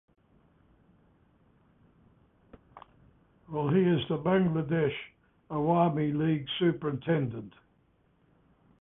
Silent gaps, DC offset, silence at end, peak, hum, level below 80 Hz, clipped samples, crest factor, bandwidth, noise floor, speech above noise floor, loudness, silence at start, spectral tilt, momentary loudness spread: none; under 0.1%; 1.3 s; -12 dBFS; none; -64 dBFS; under 0.1%; 18 dB; 3.8 kHz; -68 dBFS; 40 dB; -29 LUFS; 2.75 s; -11 dB/octave; 13 LU